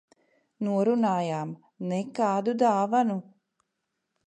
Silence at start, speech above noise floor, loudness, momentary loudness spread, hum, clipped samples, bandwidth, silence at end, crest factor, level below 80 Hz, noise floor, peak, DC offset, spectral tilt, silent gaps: 0.6 s; 55 dB; -27 LUFS; 11 LU; none; under 0.1%; 9.8 kHz; 1.05 s; 18 dB; -80 dBFS; -81 dBFS; -10 dBFS; under 0.1%; -7 dB/octave; none